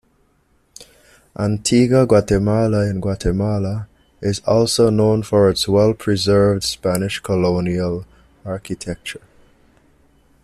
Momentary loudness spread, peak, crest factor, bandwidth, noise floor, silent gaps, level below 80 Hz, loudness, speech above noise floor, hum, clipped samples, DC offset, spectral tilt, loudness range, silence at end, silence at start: 15 LU; -2 dBFS; 16 dB; 14.5 kHz; -60 dBFS; none; -40 dBFS; -17 LUFS; 43 dB; none; under 0.1%; under 0.1%; -6 dB/octave; 6 LU; 1.25 s; 0.8 s